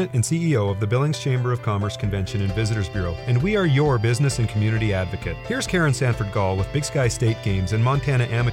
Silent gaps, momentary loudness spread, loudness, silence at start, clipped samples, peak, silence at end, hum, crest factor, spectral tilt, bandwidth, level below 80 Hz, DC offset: none; 5 LU; -22 LUFS; 0 s; under 0.1%; -8 dBFS; 0 s; none; 12 dB; -6 dB/octave; 13.5 kHz; -38 dBFS; under 0.1%